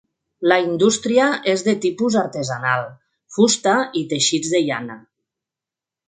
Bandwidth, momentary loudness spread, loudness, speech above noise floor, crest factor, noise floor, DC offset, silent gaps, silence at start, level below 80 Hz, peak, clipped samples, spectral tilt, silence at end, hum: 9.6 kHz; 8 LU; -19 LUFS; 70 dB; 20 dB; -88 dBFS; under 0.1%; none; 0.4 s; -64 dBFS; 0 dBFS; under 0.1%; -3.5 dB/octave; 1.1 s; none